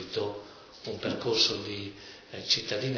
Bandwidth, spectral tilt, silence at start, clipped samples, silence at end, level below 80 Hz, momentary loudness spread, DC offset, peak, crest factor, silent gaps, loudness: 5.4 kHz; -3.5 dB/octave; 0 s; under 0.1%; 0 s; -66 dBFS; 19 LU; under 0.1%; -12 dBFS; 20 dB; none; -28 LUFS